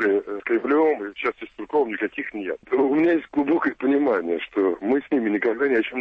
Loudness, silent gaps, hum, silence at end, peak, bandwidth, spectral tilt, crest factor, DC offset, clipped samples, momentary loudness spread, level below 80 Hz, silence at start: -23 LUFS; none; none; 0 s; -10 dBFS; 5.2 kHz; -7.5 dB/octave; 12 dB; under 0.1%; under 0.1%; 8 LU; -62 dBFS; 0 s